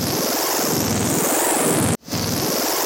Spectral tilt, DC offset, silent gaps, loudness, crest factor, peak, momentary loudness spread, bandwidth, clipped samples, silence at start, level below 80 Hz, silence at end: -3 dB/octave; under 0.1%; none; -19 LUFS; 16 dB; -4 dBFS; 4 LU; 17 kHz; under 0.1%; 0 s; -46 dBFS; 0 s